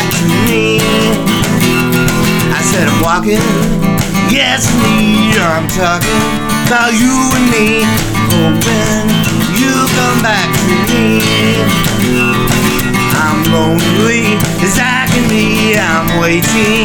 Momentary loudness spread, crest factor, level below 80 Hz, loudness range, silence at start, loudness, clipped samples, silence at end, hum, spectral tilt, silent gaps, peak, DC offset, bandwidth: 2 LU; 10 dB; -26 dBFS; 0 LU; 0 s; -10 LUFS; under 0.1%; 0 s; none; -4.5 dB/octave; none; 0 dBFS; under 0.1%; over 20 kHz